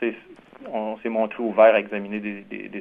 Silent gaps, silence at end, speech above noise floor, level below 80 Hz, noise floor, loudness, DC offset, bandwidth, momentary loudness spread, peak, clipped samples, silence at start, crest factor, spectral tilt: none; 0 s; 24 dB; -68 dBFS; -46 dBFS; -22 LUFS; under 0.1%; 3.9 kHz; 18 LU; -4 dBFS; under 0.1%; 0 s; 20 dB; -8 dB/octave